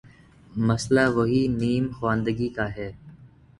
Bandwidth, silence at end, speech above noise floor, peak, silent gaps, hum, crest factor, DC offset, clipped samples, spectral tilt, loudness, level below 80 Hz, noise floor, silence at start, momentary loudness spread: 11.5 kHz; 0.35 s; 28 dB; -6 dBFS; none; none; 20 dB; under 0.1%; under 0.1%; -6.5 dB/octave; -24 LUFS; -48 dBFS; -51 dBFS; 0.5 s; 12 LU